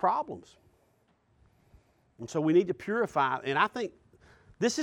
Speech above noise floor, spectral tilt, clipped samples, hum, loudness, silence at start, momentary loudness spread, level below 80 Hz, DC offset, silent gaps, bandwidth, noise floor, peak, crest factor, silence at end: 40 dB; -5 dB/octave; under 0.1%; none; -29 LUFS; 0 s; 14 LU; -68 dBFS; under 0.1%; none; 11.5 kHz; -69 dBFS; -10 dBFS; 20 dB; 0 s